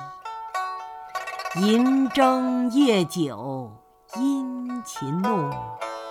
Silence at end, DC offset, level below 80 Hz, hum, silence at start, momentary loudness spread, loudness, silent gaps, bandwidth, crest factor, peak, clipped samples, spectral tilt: 0 s; under 0.1%; -64 dBFS; none; 0 s; 15 LU; -24 LUFS; none; 15.5 kHz; 18 dB; -6 dBFS; under 0.1%; -5.5 dB/octave